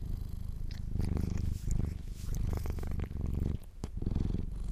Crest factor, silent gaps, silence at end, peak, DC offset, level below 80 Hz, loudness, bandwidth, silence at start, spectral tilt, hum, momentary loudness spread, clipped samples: 16 dB; none; 0 s; -20 dBFS; under 0.1%; -36 dBFS; -38 LUFS; 15 kHz; 0 s; -7.5 dB/octave; none; 8 LU; under 0.1%